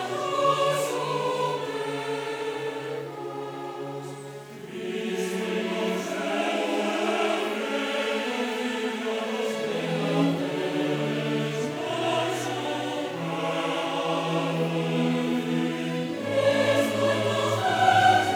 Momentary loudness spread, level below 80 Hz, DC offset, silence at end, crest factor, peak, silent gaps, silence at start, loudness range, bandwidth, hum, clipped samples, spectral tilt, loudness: 10 LU; -74 dBFS; under 0.1%; 0 s; 20 dB; -8 dBFS; none; 0 s; 7 LU; over 20 kHz; none; under 0.1%; -5 dB/octave; -26 LUFS